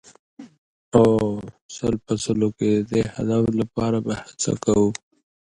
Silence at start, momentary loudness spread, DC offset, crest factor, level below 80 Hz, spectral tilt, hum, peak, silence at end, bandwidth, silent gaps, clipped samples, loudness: 0.4 s; 10 LU; under 0.1%; 22 dB; -48 dBFS; -6 dB/octave; none; -2 dBFS; 0.55 s; 11 kHz; 0.58-0.91 s, 1.61-1.69 s; under 0.1%; -22 LUFS